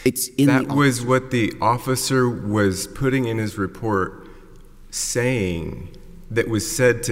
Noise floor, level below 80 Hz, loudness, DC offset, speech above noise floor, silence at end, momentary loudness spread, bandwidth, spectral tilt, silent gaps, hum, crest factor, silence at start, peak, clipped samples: -43 dBFS; -42 dBFS; -21 LUFS; under 0.1%; 22 dB; 0 s; 9 LU; 16 kHz; -5 dB/octave; none; none; 18 dB; 0 s; -4 dBFS; under 0.1%